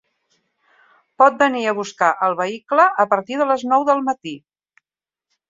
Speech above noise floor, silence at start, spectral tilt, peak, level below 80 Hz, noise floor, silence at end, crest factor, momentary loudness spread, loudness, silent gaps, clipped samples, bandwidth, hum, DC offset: over 73 dB; 1.2 s; -4.5 dB/octave; -2 dBFS; -70 dBFS; under -90 dBFS; 1.1 s; 18 dB; 10 LU; -18 LUFS; none; under 0.1%; 7.8 kHz; none; under 0.1%